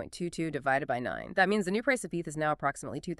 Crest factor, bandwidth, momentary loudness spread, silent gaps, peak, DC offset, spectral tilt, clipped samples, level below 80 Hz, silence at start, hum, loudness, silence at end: 20 dB; 13.5 kHz; 8 LU; none; -10 dBFS; under 0.1%; -5 dB/octave; under 0.1%; -60 dBFS; 0 s; none; -31 LUFS; 0.05 s